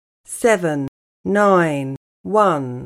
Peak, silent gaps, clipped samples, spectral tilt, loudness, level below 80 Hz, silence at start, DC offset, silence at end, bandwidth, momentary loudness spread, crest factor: -2 dBFS; 0.88-1.24 s, 1.97-2.24 s; under 0.1%; -6 dB/octave; -18 LUFS; -58 dBFS; 0.3 s; under 0.1%; 0 s; 16 kHz; 16 LU; 16 dB